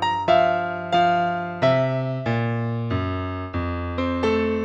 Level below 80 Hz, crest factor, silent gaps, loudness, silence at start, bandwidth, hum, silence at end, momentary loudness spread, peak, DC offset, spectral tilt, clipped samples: -46 dBFS; 16 dB; none; -22 LUFS; 0 s; 8 kHz; none; 0 s; 8 LU; -6 dBFS; under 0.1%; -7.5 dB/octave; under 0.1%